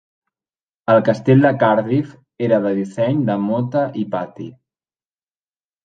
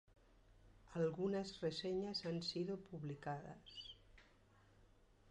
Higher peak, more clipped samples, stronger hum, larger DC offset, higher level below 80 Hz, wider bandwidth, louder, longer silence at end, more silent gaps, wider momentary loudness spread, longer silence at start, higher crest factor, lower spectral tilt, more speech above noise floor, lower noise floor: first, -2 dBFS vs -30 dBFS; neither; neither; neither; first, -60 dBFS vs -72 dBFS; second, 9 kHz vs 11 kHz; first, -17 LUFS vs -45 LUFS; first, 1.35 s vs 0 s; neither; first, 15 LU vs 12 LU; first, 0.9 s vs 0.5 s; about the same, 16 dB vs 18 dB; first, -9 dB/octave vs -6 dB/octave; first, over 73 dB vs 26 dB; first, under -90 dBFS vs -70 dBFS